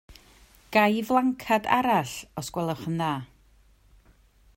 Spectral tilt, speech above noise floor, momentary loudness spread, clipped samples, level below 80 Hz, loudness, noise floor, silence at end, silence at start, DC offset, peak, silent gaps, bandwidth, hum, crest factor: -5 dB/octave; 34 dB; 12 LU; under 0.1%; -58 dBFS; -26 LUFS; -59 dBFS; 1.3 s; 0.1 s; under 0.1%; -6 dBFS; none; 16.5 kHz; none; 22 dB